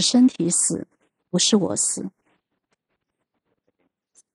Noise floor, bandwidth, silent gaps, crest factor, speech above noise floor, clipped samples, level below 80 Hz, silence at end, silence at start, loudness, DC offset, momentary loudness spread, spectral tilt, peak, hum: -78 dBFS; 12.5 kHz; none; 18 dB; 58 dB; under 0.1%; -70 dBFS; 2.25 s; 0 s; -20 LUFS; under 0.1%; 12 LU; -3.5 dB/octave; -6 dBFS; none